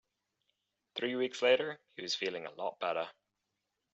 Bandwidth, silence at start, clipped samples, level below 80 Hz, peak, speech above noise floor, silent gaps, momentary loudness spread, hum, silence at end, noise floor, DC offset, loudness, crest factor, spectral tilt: 8 kHz; 0.95 s; under 0.1%; -86 dBFS; -16 dBFS; 51 dB; none; 13 LU; none; 0.8 s; -86 dBFS; under 0.1%; -35 LUFS; 22 dB; -1 dB/octave